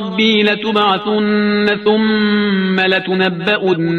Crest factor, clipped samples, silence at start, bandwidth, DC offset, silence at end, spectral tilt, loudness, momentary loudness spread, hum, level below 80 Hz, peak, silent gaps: 14 dB; under 0.1%; 0 s; 6.4 kHz; under 0.1%; 0 s; -6.5 dB/octave; -14 LUFS; 2 LU; none; -54 dBFS; 0 dBFS; none